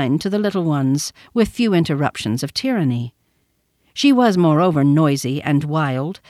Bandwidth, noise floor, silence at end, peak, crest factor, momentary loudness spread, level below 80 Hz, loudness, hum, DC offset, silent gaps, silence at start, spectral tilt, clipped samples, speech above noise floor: 14.5 kHz; -65 dBFS; 0.15 s; -2 dBFS; 16 dB; 8 LU; -50 dBFS; -18 LUFS; none; under 0.1%; none; 0 s; -6 dB/octave; under 0.1%; 48 dB